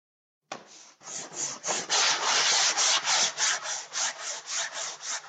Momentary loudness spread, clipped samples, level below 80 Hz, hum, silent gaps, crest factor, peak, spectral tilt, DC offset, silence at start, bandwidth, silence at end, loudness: 19 LU; under 0.1%; -88 dBFS; none; none; 18 dB; -10 dBFS; 2 dB/octave; under 0.1%; 0.5 s; 9.6 kHz; 0 s; -25 LUFS